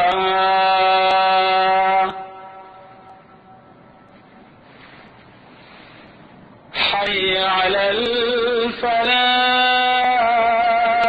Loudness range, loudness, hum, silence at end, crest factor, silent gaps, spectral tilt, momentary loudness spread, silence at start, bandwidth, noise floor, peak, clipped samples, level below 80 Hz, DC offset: 10 LU; -16 LUFS; none; 0 s; 14 dB; none; -4.5 dB/octave; 5 LU; 0 s; 7.8 kHz; -46 dBFS; -6 dBFS; under 0.1%; -54 dBFS; under 0.1%